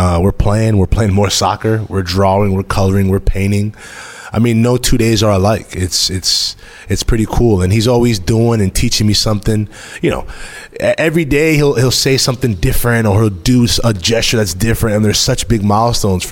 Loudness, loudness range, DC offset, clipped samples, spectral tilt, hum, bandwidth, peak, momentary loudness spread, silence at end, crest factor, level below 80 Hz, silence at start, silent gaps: -13 LUFS; 2 LU; under 0.1%; under 0.1%; -5 dB/octave; none; 17 kHz; -2 dBFS; 7 LU; 0 s; 12 dB; -24 dBFS; 0 s; none